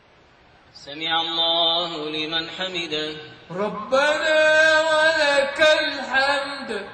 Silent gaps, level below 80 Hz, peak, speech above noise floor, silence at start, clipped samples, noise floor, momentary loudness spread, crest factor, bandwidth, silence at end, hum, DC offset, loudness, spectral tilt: none; -58 dBFS; -6 dBFS; 33 dB; 0.75 s; under 0.1%; -53 dBFS; 12 LU; 16 dB; 9.4 kHz; 0 s; none; under 0.1%; -20 LUFS; -2 dB/octave